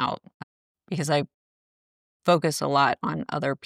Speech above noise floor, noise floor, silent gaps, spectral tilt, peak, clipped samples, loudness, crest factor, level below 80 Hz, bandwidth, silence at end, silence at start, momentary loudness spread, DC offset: over 66 dB; under -90 dBFS; 0.34-0.75 s, 1.34-2.20 s; -5 dB/octave; -8 dBFS; under 0.1%; -25 LUFS; 20 dB; -66 dBFS; 15 kHz; 0.1 s; 0 s; 11 LU; under 0.1%